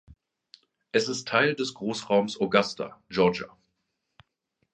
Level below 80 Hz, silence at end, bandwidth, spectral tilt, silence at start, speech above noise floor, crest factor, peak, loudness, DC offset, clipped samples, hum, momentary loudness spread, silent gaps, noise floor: -64 dBFS; 1.25 s; 9.6 kHz; -4.5 dB/octave; 0.95 s; 53 dB; 26 dB; -2 dBFS; -26 LUFS; under 0.1%; under 0.1%; none; 10 LU; none; -79 dBFS